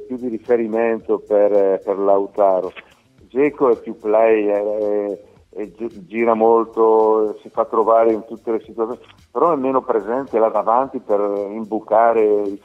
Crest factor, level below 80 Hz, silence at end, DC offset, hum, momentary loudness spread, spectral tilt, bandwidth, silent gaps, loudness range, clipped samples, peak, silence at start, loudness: 16 dB; -60 dBFS; 0.05 s; under 0.1%; none; 12 LU; -8 dB/octave; 4.8 kHz; none; 2 LU; under 0.1%; 0 dBFS; 0 s; -18 LUFS